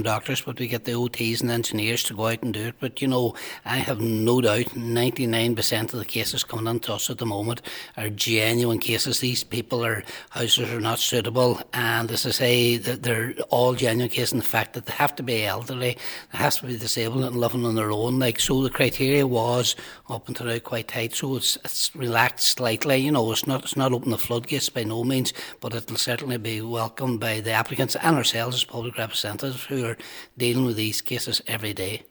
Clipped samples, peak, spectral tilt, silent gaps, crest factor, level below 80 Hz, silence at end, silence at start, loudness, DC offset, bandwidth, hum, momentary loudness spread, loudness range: under 0.1%; -2 dBFS; -4 dB/octave; none; 22 dB; -56 dBFS; 0.1 s; 0 s; -24 LUFS; under 0.1%; over 20 kHz; none; 8 LU; 3 LU